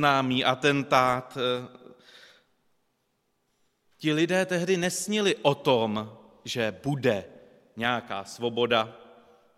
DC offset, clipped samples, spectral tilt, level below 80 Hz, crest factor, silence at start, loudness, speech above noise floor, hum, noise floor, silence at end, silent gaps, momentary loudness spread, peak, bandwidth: under 0.1%; under 0.1%; -4.5 dB/octave; -66 dBFS; 22 dB; 0 s; -26 LUFS; 49 dB; none; -75 dBFS; 0.6 s; none; 11 LU; -6 dBFS; 15.5 kHz